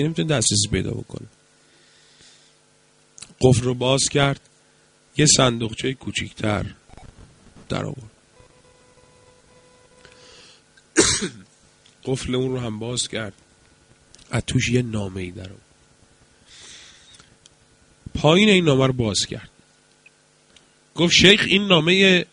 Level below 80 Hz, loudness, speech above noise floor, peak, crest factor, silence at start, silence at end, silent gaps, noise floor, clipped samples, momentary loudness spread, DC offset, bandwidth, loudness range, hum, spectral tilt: -46 dBFS; -19 LUFS; 38 dB; 0 dBFS; 22 dB; 0 s; 0.1 s; none; -58 dBFS; under 0.1%; 21 LU; under 0.1%; 10.5 kHz; 13 LU; none; -3.5 dB/octave